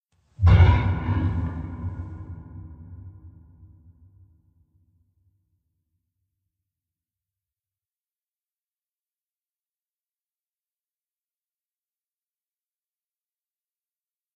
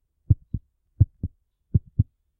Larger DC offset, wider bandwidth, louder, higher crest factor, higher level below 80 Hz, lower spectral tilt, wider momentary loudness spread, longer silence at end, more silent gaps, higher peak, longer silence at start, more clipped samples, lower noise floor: neither; first, 4.8 kHz vs 0.8 kHz; first, -22 LUFS vs -26 LUFS; about the same, 24 dB vs 22 dB; about the same, -36 dBFS vs -34 dBFS; second, -9 dB/octave vs -16 dB/octave; first, 27 LU vs 13 LU; first, 11.1 s vs 0.35 s; neither; about the same, -4 dBFS vs -4 dBFS; about the same, 0.4 s vs 0.3 s; neither; first, under -90 dBFS vs -39 dBFS